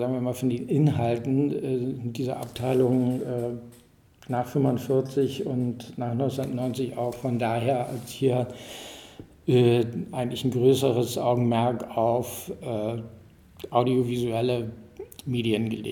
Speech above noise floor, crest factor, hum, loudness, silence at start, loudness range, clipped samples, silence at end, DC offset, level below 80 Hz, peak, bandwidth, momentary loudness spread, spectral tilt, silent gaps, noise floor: 21 dB; 20 dB; none; -26 LUFS; 0 s; 4 LU; under 0.1%; 0 s; under 0.1%; -60 dBFS; -6 dBFS; 18 kHz; 12 LU; -7 dB/octave; none; -47 dBFS